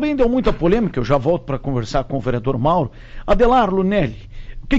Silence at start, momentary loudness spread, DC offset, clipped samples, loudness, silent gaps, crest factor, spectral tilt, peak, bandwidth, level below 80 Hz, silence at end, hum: 0 s; 9 LU; under 0.1%; under 0.1%; -18 LUFS; none; 12 dB; -7.5 dB/octave; -6 dBFS; 7.8 kHz; -28 dBFS; 0 s; none